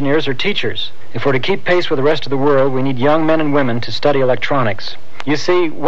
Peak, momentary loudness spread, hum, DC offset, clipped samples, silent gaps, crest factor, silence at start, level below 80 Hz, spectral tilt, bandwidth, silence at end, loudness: 0 dBFS; 7 LU; none; 20%; under 0.1%; none; 16 dB; 0 s; -54 dBFS; -6 dB/octave; 8.2 kHz; 0 s; -16 LUFS